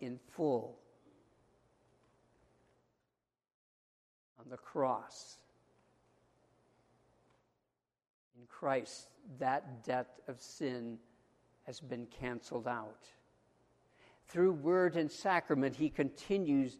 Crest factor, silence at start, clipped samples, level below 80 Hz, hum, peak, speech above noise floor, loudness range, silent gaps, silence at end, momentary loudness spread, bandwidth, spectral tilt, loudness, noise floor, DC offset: 24 dB; 0 s; under 0.1%; -72 dBFS; none; -16 dBFS; 51 dB; 11 LU; 3.54-4.36 s, 8.10-8.31 s; 0.05 s; 19 LU; 12.5 kHz; -6 dB/octave; -37 LUFS; -88 dBFS; under 0.1%